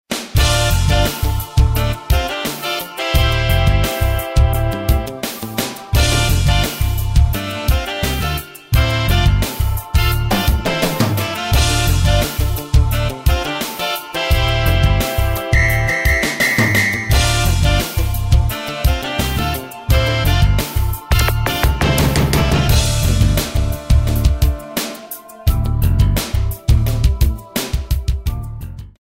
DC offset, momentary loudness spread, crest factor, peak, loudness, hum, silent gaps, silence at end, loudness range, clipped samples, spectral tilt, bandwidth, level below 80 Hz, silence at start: under 0.1%; 7 LU; 14 dB; -2 dBFS; -17 LUFS; none; none; 0.25 s; 3 LU; under 0.1%; -4.5 dB/octave; 16.5 kHz; -18 dBFS; 0.1 s